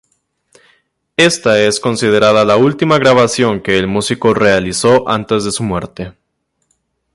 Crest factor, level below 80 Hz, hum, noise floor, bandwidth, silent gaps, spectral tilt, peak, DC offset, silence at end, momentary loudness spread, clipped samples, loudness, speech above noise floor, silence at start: 14 dB; -44 dBFS; none; -67 dBFS; 11.5 kHz; none; -4.5 dB/octave; 0 dBFS; under 0.1%; 1.05 s; 10 LU; under 0.1%; -12 LUFS; 56 dB; 1.2 s